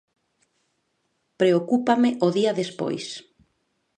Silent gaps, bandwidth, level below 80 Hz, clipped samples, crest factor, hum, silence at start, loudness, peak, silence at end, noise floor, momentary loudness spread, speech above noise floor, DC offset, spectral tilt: none; 9.6 kHz; -72 dBFS; under 0.1%; 20 dB; none; 1.4 s; -22 LUFS; -6 dBFS; 0.8 s; -73 dBFS; 12 LU; 51 dB; under 0.1%; -6 dB/octave